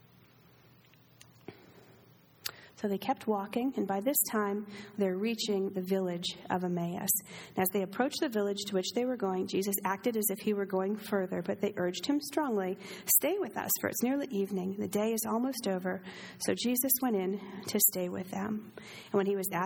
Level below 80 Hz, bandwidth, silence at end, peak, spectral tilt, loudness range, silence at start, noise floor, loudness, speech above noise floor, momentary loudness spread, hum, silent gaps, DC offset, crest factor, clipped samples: -76 dBFS; over 20 kHz; 0 s; -10 dBFS; -4 dB/octave; 3 LU; 1.5 s; -61 dBFS; -32 LUFS; 29 dB; 11 LU; none; none; under 0.1%; 24 dB; under 0.1%